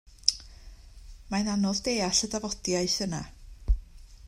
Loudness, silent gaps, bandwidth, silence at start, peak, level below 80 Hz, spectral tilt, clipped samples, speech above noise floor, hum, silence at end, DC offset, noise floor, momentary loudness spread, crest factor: -28 LUFS; none; 15.5 kHz; 0.1 s; -2 dBFS; -38 dBFS; -3 dB/octave; under 0.1%; 19 dB; none; 0 s; under 0.1%; -48 dBFS; 12 LU; 28 dB